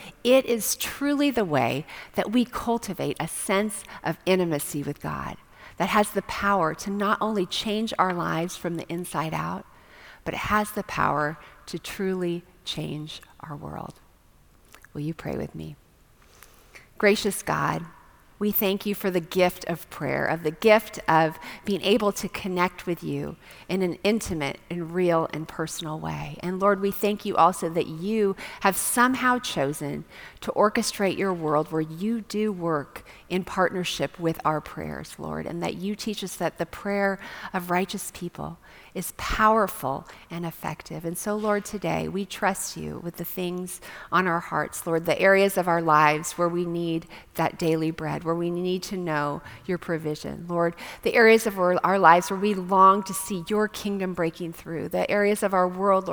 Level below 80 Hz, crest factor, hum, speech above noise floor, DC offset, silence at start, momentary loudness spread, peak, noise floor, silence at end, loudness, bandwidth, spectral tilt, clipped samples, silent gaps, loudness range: -52 dBFS; 24 dB; none; 31 dB; under 0.1%; 0 s; 14 LU; -2 dBFS; -57 dBFS; 0 s; -25 LUFS; over 20 kHz; -4.5 dB/octave; under 0.1%; none; 7 LU